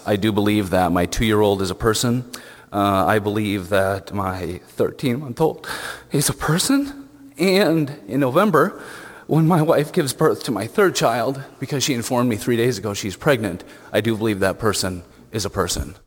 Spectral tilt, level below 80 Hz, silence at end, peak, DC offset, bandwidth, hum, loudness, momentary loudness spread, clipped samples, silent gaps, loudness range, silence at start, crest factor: -5 dB/octave; -42 dBFS; 0.15 s; -2 dBFS; under 0.1%; 17.5 kHz; none; -20 LUFS; 11 LU; under 0.1%; none; 3 LU; 0 s; 18 dB